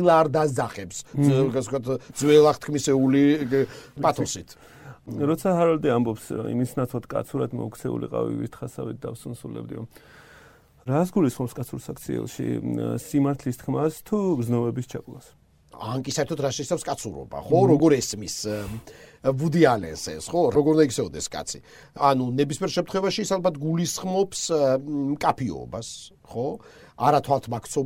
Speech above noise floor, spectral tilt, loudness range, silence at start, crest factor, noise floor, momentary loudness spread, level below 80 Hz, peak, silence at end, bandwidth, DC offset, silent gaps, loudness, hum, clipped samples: 29 dB; -6 dB/octave; 8 LU; 0 s; 22 dB; -53 dBFS; 15 LU; -56 dBFS; -2 dBFS; 0 s; 16.5 kHz; under 0.1%; none; -24 LUFS; none; under 0.1%